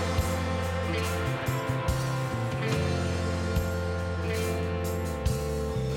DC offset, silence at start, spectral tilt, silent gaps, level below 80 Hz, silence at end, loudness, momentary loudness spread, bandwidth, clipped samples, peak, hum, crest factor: under 0.1%; 0 s; -6 dB/octave; none; -38 dBFS; 0 s; -30 LUFS; 2 LU; 17 kHz; under 0.1%; -14 dBFS; none; 14 dB